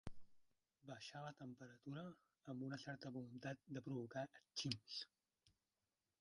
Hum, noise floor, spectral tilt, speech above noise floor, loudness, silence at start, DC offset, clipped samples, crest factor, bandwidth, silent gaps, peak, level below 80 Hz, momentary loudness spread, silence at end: none; under -90 dBFS; -5 dB/octave; over 38 dB; -52 LUFS; 0.05 s; under 0.1%; under 0.1%; 26 dB; 11 kHz; none; -28 dBFS; -76 dBFS; 11 LU; 0.7 s